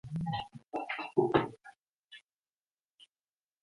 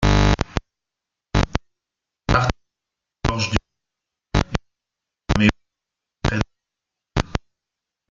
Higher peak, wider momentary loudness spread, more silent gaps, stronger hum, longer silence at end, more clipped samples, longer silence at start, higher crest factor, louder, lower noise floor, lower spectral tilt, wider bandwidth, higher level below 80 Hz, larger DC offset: second, -12 dBFS vs -2 dBFS; first, 26 LU vs 12 LU; neither; neither; first, 1.45 s vs 0.75 s; neither; about the same, 0.05 s vs 0 s; about the same, 24 dB vs 22 dB; second, -34 LUFS vs -23 LUFS; first, under -90 dBFS vs -85 dBFS; first, -7.5 dB/octave vs -5.5 dB/octave; first, 11 kHz vs 7.6 kHz; second, -64 dBFS vs -30 dBFS; neither